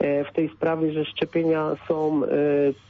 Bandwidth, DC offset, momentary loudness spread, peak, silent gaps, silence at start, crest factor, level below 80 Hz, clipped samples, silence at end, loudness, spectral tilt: 6.2 kHz; under 0.1%; 4 LU; -12 dBFS; none; 0 s; 12 dB; -62 dBFS; under 0.1%; 0.15 s; -24 LUFS; -8.5 dB/octave